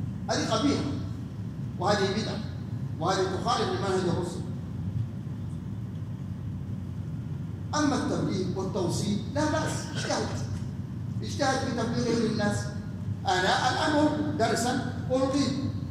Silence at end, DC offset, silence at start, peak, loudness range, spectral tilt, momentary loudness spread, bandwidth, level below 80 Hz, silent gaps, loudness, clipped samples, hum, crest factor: 0 s; under 0.1%; 0 s; -12 dBFS; 6 LU; -5.5 dB/octave; 10 LU; 15.5 kHz; -52 dBFS; none; -29 LUFS; under 0.1%; none; 16 dB